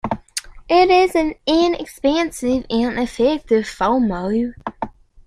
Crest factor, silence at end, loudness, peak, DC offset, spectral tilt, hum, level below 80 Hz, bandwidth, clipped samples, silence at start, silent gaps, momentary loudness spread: 16 dB; 0.35 s; -18 LUFS; -2 dBFS; under 0.1%; -4.5 dB/octave; none; -42 dBFS; 15 kHz; under 0.1%; 0.05 s; none; 15 LU